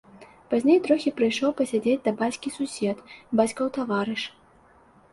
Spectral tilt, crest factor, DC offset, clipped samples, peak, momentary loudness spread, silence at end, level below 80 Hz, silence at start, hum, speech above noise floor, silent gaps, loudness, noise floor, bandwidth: -5 dB/octave; 18 dB; under 0.1%; under 0.1%; -6 dBFS; 10 LU; 0.85 s; -66 dBFS; 0.15 s; none; 32 dB; none; -25 LUFS; -56 dBFS; 11.5 kHz